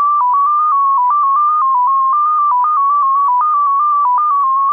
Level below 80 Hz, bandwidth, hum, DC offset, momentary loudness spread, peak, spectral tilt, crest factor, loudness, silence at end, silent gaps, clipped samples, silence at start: -74 dBFS; 3.2 kHz; none; under 0.1%; 0 LU; -8 dBFS; -3.5 dB/octave; 4 dB; -12 LUFS; 0 s; none; under 0.1%; 0 s